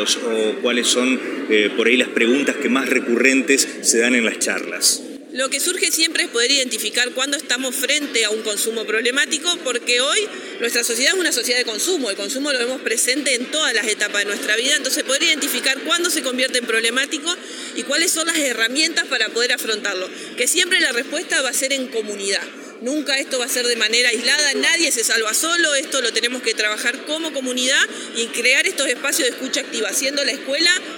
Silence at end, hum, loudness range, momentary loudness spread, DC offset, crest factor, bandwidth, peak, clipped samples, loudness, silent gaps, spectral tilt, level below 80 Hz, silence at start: 0 s; none; 2 LU; 7 LU; under 0.1%; 20 dB; 17.5 kHz; 0 dBFS; under 0.1%; -18 LUFS; none; 0 dB/octave; -90 dBFS; 0 s